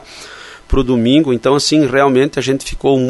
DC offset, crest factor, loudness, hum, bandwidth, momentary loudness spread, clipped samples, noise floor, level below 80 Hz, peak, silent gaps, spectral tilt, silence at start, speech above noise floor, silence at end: under 0.1%; 12 dB; -13 LUFS; none; 12 kHz; 20 LU; under 0.1%; -35 dBFS; -28 dBFS; 0 dBFS; none; -5 dB/octave; 0.1 s; 22 dB; 0 s